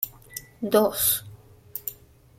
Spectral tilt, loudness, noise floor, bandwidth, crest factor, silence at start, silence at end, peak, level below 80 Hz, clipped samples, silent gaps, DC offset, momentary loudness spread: -3 dB/octave; -24 LUFS; -48 dBFS; 16.5 kHz; 24 dB; 0 s; 0.45 s; -4 dBFS; -58 dBFS; under 0.1%; none; under 0.1%; 18 LU